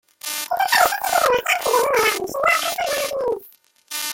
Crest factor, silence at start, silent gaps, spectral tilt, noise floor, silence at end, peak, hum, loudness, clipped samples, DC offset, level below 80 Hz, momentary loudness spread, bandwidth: 18 dB; 0.25 s; none; -0.5 dB/octave; -50 dBFS; 0 s; -2 dBFS; none; -19 LUFS; under 0.1%; under 0.1%; -56 dBFS; 10 LU; 17 kHz